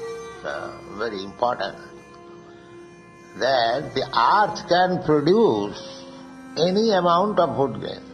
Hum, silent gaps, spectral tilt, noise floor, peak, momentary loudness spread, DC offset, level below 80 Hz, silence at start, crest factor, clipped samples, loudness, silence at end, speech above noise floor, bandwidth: none; none; -5.5 dB/octave; -45 dBFS; -4 dBFS; 19 LU; under 0.1%; -56 dBFS; 0 s; 18 dB; under 0.1%; -21 LUFS; 0 s; 24 dB; 10 kHz